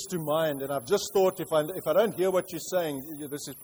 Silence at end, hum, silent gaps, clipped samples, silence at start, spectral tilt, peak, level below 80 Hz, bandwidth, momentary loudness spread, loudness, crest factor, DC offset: 0 s; none; none; under 0.1%; 0 s; -4.5 dB/octave; -12 dBFS; -66 dBFS; over 20 kHz; 11 LU; -28 LUFS; 16 dB; under 0.1%